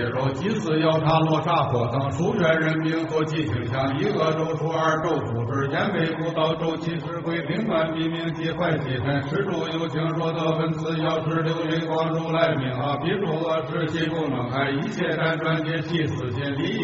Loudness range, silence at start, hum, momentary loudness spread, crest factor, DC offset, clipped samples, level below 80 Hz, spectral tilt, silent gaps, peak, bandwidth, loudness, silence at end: 3 LU; 0 s; none; 5 LU; 18 dB; under 0.1%; under 0.1%; -54 dBFS; -5 dB/octave; none; -6 dBFS; 7.6 kHz; -24 LUFS; 0 s